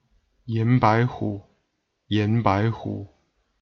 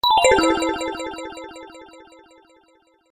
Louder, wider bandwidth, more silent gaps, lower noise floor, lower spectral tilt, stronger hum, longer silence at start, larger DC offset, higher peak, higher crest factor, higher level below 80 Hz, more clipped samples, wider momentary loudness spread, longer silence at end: second, -23 LUFS vs -19 LUFS; second, 6.4 kHz vs 14.5 kHz; neither; first, -74 dBFS vs -59 dBFS; first, -8.5 dB/octave vs -2.5 dB/octave; neither; first, 0.45 s vs 0.05 s; neither; about the same, -4 dBFS vs -2 dBFS; about the same, 20 dB vs 20 dB; second, -54 dBFS vs -48 dBFS; neither; second, 14 LU vs 24 LU; second, 0.55 s vs 1.1 s